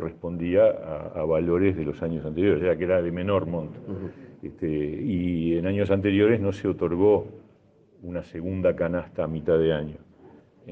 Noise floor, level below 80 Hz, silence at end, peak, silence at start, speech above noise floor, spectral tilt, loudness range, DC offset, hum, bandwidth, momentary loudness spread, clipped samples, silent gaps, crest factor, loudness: -58 dBFS; -54 dBFS; 0 s; -8 dBFS; 0 s; 33 dB; -9 dB/octave; 3 LU; under 0.1%; none; 6.4 kHz; 15 LU; under 0.1%; none; 18 dB; -25 LUFS